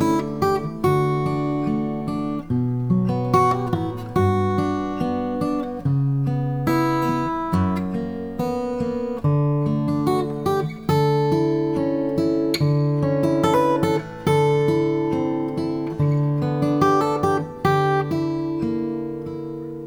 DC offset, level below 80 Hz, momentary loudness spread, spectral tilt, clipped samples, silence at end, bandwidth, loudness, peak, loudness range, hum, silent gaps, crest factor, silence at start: under 0.1%; -48 dBFS; 7 LU; -8 dB/octave; under 0.1%; 0 s; 18 kHz; -22 LUFS; -4 dBFS; 3 LU; none; none; 16 dB; 0 s